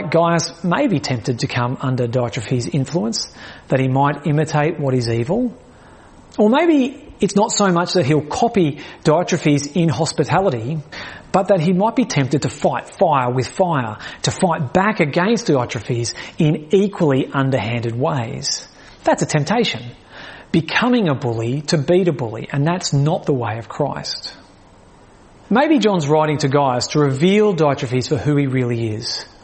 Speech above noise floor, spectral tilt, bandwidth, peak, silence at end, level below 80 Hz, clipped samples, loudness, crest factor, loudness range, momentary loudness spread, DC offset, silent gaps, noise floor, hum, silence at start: 28 dB; -5.5 dB/octave; 8.8 kHz; -2 dBFS; 0.15 s; -50 dBFS; under 0.1%; -18 LUFS; 16 dB; 3 LU; 8 LU; under 0.1%; none; -46 dBFS; none; 0 s